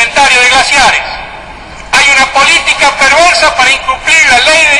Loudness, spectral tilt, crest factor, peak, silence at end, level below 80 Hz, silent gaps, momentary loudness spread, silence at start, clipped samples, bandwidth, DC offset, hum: -5 LUFS; 0 dB/octave; 6 dB; 0 dBFS; 0 s; -32 dBFS; none; 8 LU; 0 s; 0.6%; over 20 kHz; under 0.1%; none